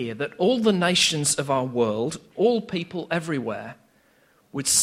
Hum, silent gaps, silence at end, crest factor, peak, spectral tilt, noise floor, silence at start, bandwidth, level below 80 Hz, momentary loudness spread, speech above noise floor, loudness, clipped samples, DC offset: none; none; 0 s; 18 dB; -6 dBFS; -3 dB/octave; -61 dBFS; 0 s; 16 kHz; -62 dBFS; 11 LU; 37 dB; -23 LUFS; under 0.1%; under 0.1%